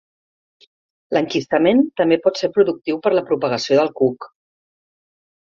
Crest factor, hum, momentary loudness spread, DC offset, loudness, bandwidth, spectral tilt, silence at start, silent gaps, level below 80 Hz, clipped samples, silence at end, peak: 18 dB; none; 5 LU; under 0.1%; -18 LUFS; 7.4 kHz; -5.5 dB/octave; 1.1 s; none; -64 dBFS; under 0.1%; 1.15 s; -2 dBFS